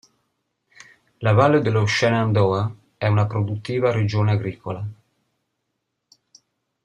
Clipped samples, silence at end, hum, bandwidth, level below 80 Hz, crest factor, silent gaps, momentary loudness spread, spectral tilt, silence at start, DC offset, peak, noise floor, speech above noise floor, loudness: under 0.1%; 1.9 s; none; 8 kHz; -56 dBFS; 20 dB; none; 12 LU; -7 dB/octave; 1.2 s; under 0.1%; -2 dBFS; -77 dBFS; 58 dB; -21 LUFS